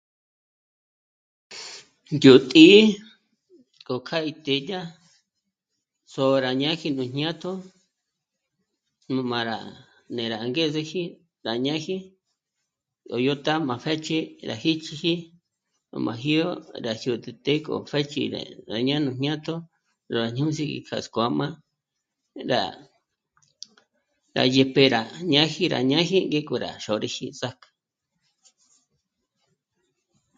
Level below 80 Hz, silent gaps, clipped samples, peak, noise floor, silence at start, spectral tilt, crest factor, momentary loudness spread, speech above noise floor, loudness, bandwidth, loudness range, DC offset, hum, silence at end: -68 dBFS; none; under 0.1%; 0 dBFS; -82 dBFS; 1.5 s; -5.5 dB/octave; 24 dB; 16 LU; 59 dB; -23 LUFS; 7.8 kHz; 12 LU; under 0.1%; none; 2.85 s